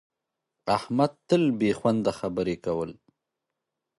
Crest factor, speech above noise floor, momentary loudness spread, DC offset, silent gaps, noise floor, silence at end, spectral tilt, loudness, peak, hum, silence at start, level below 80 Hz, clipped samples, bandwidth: 20 dB; 59 dB; 7 LU; under 0.1%; none; -85 dBFS; 1.05 s; -7 dB/octave; -26 LUFS; -8 dBFS; none; 0.65 s; -60 dBFS; under 0.1%; 11.5 kHz